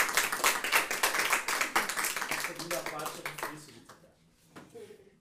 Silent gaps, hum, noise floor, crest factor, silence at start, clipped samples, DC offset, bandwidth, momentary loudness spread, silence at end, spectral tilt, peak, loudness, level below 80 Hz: none; none; -63 dBFS; 22 dB; 0 s; under 0.1%; under 0.1%; 16 kHz; 16 LU; 0.15 s; 0 dB/octave; -12 dBFS; -30 LUFS; -64 dBFS